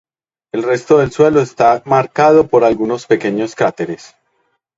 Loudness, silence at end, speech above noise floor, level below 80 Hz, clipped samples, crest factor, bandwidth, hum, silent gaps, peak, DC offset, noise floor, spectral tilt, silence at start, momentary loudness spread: -13 LUFS; 0.8 s; 52 dB; -50 dBFS; under 0.1%; 14 dB; 7.8 kHz; none; none; 0 dBFS; under 0.1%; -65 dBFS; -6.5 dB/octave; 0.55 s; 12 LU